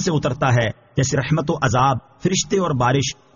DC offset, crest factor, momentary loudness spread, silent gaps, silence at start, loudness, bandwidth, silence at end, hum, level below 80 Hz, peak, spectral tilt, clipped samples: under 0.1%; 14 dB; 4 LU; none; 0 s; -19 LUFS; 7.4 kHz; 0.25 s; none; -44 dBFS; -4 dBFS; -5 dB/octave; under 0.1%